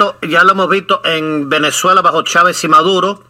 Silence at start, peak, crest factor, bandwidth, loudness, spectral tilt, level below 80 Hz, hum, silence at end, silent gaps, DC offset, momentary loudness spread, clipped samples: 0 s; 0 dBFS; 12 dB; 16.5 kHz; -10 LUFS; -3 dB/octave; -58 dBFS; none; 0.15 s; none; under 0.1%; 5 LU; 0.2%